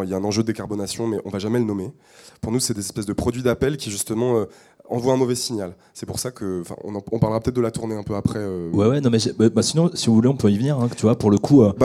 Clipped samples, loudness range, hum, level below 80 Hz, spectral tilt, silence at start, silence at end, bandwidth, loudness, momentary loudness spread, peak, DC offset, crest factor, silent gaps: under 0.1%; 6 LU; none; -50 dBFS; -6 dB/octave; 0 s; 0 s; 15.5 kHz; -21 LUFS; 12 LU; -4 dBFS; under 0.1%; 16 dB; none